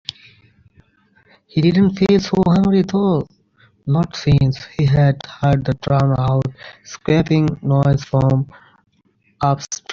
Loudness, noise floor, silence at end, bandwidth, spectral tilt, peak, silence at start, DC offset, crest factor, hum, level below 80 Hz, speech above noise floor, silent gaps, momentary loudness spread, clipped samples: -17 LUFS; -60 dBFS; 0 s; 7.2 kHz; -7.5 dB/octave; -2 dBFS; 1.55 s; under 0.1%; 14 dB; none; -42 dBFS; 44 dB; none; 11 LU; under 0.1%